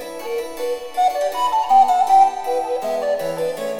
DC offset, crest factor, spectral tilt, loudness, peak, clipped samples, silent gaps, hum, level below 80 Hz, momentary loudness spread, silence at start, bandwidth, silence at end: under 0.1%; 14 dB; -3 dB/octave; -18 LUFS; -4 dBFS; under 0.1%; none; none; -58 dBFS; 12 LU; 0 s; 17 kHz; 0 s